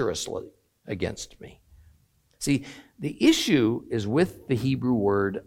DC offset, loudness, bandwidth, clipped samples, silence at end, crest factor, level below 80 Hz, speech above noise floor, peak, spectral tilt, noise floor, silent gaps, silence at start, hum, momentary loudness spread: under 0.1%; -25 LUFS; 16.5 kHz; under 0.1%; 0.05 s; 18 dB; -54 dBFS; 38 dB; -8 dBFS; -5 dB/octave; -63 dBFS; none; 0 s; none; 16 LU